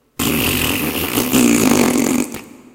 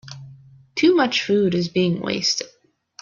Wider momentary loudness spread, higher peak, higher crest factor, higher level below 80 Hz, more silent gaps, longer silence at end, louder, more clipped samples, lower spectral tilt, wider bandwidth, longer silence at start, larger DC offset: second, 8 LU vs 19 LU; first, 0 dBFS vs -6 dBFS; about the same, 16 dB vs 16 dB; first, -38 dBFS vs -60 dBFS; neither; second, 0.2 s vs 0.55 s; first, -15 LUFS vs -20 LUFS; neither; about the same, -3.5 dB/octave vs -4.5 dB/octave; first, 17.5 kHz vs 7.4 kHz; first, 0.2 s vs 0.05 s; neither